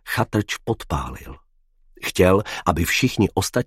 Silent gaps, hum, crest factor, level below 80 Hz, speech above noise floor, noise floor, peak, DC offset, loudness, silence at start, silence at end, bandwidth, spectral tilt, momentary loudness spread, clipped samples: none; none; 22 dB; -38 dBFS; 36 dB; -56 dBFS; 0 dBFS; under 0.1%; -21 LUFS; 0.05 s; 0 s; 16.5 kHz; -5 dB/octave; 11 LU; under 0.1%